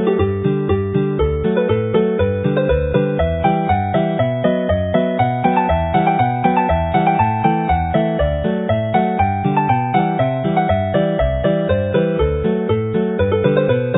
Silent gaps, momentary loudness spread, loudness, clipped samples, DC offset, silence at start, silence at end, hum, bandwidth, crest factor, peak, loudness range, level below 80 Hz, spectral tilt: none; 2 LU; -17 LUFS; under 0.1%; under 0.1%; 0 s; 0 s; none; 4 kHz; 16 dB; 0 dBFS; 1 LU; -30 dBFS; -13 dB/octave